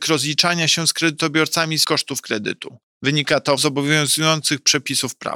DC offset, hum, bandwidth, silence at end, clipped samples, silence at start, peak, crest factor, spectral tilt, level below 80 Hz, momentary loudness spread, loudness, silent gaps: under 0.1%; none; 17.5 kHz; 0 s; under 0.1%; 0 s; -4 dBFS; 16 dB; -2.5 dB/octave; -66 dBFS; 8 LU; -18 LUFS; 2.83-3.01 s